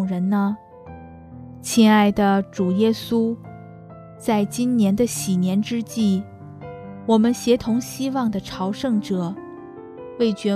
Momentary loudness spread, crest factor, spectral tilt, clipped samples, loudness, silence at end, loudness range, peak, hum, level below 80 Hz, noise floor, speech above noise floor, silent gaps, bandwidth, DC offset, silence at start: 23 LU; 16 dB; -6 dB/octave; under 0.1%; -21 LUFS; 0 s; 2 LU; -4 dBFS; none; -54 dBFS; -41 dBFS; 21 dB; none; 14 kHz; under 0.1%; 0 s